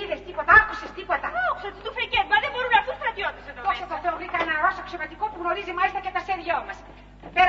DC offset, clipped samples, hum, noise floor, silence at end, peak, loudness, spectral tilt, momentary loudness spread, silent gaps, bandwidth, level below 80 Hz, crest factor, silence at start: under 0.1%; under 0.1%; 50 Hz at -50 dBFS; -45 dBFS; 0 s; -2 dBFS; -24 LUFS; -4 dB/octave; 13 LU; none; 7.6 kHz; -48 dBFS; 22 dB; 0 s